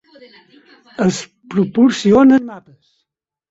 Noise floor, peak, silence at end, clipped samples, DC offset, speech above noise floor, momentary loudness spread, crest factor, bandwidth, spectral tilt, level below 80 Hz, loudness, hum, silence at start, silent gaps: -76 dBFS; -2 dBFS; 0.9 s; under 0.1%; under 0.1%; 63 dB; 18 LU; 14 dB; 8 kHz; -6 dB/octave; -52 dBFS; -14 LUFS; none; 1 s; none